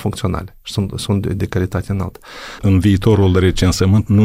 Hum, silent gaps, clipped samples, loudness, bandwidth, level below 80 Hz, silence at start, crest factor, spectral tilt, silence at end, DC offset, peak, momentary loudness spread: none; none; under 0.1%; -16 LUFS; 15 kHz; -32 dBFS; 0 s; 14 dB; -6.5 dB/octave; 0 s; under 0.1%; -2 dBFS; 12 LU